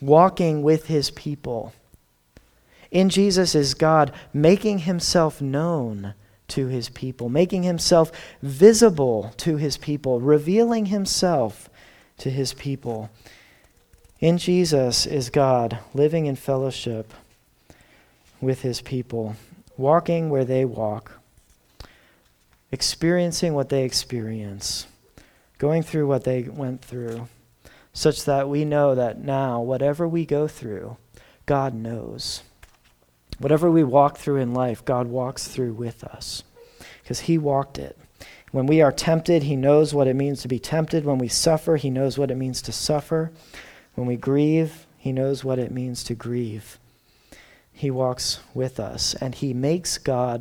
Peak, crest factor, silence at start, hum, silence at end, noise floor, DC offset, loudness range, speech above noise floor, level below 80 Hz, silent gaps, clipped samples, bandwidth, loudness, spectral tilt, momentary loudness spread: 0 dBFS; 22 dB; 0 s; none; 0 s; -60 dBFS; under 0.1%; 8 LU; 39 dB; -50 dBFS; none; under 0.1%; 18 kHz; -22 LUFS; -5.5 dB/octave; 14 LU